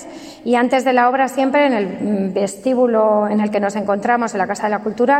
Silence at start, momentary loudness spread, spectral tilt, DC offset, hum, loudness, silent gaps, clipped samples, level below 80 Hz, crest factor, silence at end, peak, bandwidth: 0 s; 6 LU; -5.5 dB/octave; under 0.1%; none; -17 LUFS; none; under 0.1%; -60 dBFS; 14 dB; 0 s; -2 dBFS; 14 kHz